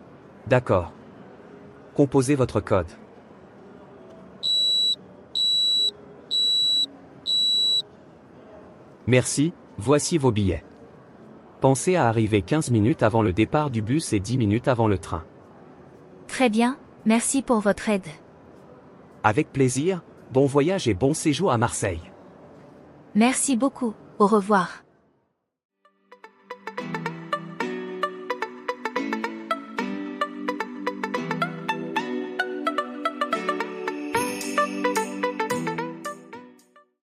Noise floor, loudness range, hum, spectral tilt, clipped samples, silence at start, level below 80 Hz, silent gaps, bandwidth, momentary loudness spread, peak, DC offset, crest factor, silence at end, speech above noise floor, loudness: -72 dBFS; 8 LU; none; -4.5 dB/octave; under 0.1%; 0 s; -56 dBFS; 25.65-25.69 s; 15.5 kHz; 12 LU; -4 dBFS; under 0.1%; 22 dB; 0.7 s; 50 dB; -23 LUFS